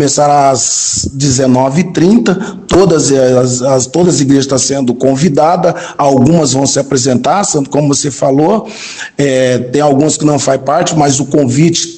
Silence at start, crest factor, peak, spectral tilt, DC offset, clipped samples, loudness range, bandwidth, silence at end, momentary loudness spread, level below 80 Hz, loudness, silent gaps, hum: 0 s; 10 dB; 0 dBFS; -5 dB/octave; 0.2%; 1%; 2 LU; 12 kHz; 0 s; 4 LU; -40 dBFS; -10 LUFS; none; none